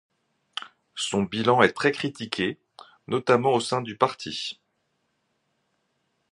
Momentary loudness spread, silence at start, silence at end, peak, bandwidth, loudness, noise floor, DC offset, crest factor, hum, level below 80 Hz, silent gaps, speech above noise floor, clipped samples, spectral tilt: 17 LU; 0.55 s; 1.8 s; -2 dBFS; 11.5 kHz; -25 LUFS; -74 dBFS; under 0.1%; 26 dB; none; -64 dBFS; none; 50 dB; under 0.1%; -4.5 dB/octave